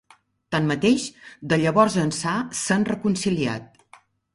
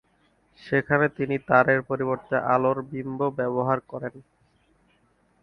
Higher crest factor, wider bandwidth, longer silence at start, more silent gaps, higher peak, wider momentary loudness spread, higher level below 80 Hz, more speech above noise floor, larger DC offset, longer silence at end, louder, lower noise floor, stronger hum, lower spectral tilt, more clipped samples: about the same, 20 dB vs 24 dB; first, 11.5 kHz vs 6.2 kHz; about the same, 0.5 s vs 0.6 s; neither; about the same, -4 dBFS vs -2 dBFS; about the same, 9 LU vs 11 LU; first, -56 dBFS vs -62 dBFS; second, 32 dB vs 41 dB; neither; second, 0.7 s vs 1.2 s; about the same, -22 LUFS vs -24 LUFS; second, -54 dBFS vs -65 dBFS; neither; second, -5 dB/octave vs -9 dB/octave; neither